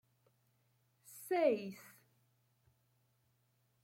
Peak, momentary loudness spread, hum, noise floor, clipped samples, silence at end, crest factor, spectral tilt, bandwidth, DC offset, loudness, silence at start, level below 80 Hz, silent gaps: -20 dBFS; 23 LU; none; -78 dBFS; under 0.1%; 2 s; 24 dB; -5 dB/octave; 16.5 kHz; under 0.1%; -36 LUFS; 1.1 s; under -90 dBFS; none